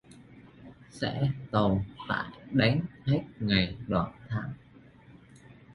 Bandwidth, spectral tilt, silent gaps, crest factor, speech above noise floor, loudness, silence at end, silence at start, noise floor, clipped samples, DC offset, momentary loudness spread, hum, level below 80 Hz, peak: 11 kHz; -7.5 dB/octave; none; 22 dB; 26 dB; -30 LUFS; 0 s; 0.1 s; -55 dBFS; under 0.1%; under 0.1%; 9 LU; none; -52 dBFS; -10 dBFS